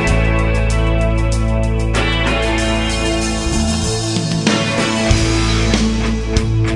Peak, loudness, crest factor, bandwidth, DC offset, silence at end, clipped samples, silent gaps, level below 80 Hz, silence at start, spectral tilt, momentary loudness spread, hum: 0 dBFS; -16 LUFS; 14 dB; 11.5 kHz; under 0.1%; 0 s; under 0.1%; none; -20 dBFS; 0 s; -5 dB/octave; 3 LU; none